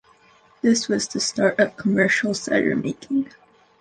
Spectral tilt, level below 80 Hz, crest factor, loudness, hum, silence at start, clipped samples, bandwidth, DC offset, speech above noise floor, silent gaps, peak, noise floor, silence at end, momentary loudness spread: -4 dB/octave; -62 dBFS; 18 dB; -21 LUFS; none; 0.65 s; under 0.1%; 10 kHz; under 0.1%; 34 dB; none; -4 dBFS; -55 dBFS; 0.55 s; 7 LU